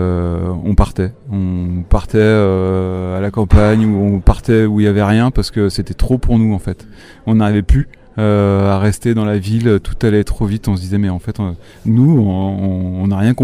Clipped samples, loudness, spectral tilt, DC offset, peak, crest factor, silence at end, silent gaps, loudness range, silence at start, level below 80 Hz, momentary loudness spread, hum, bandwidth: under 0.1%; -15 LUFS; -8 dB/octave; under 0.1%; 0 dBFS; 14 dB; 0 s; none; 3 LU; 0 s; -22 dBFS; 9 LU; none; 12.5 kHz